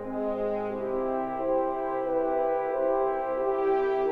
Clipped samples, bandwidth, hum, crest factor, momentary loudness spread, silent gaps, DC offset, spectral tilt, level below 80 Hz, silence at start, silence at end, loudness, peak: under 0.1%; 5 kHz; none; 12 dB; 4 LU; none; under 0.1%; -8 dB/octave; -52 dBFS; 0 s; 0 s; -28 LUFS; -16 dBFS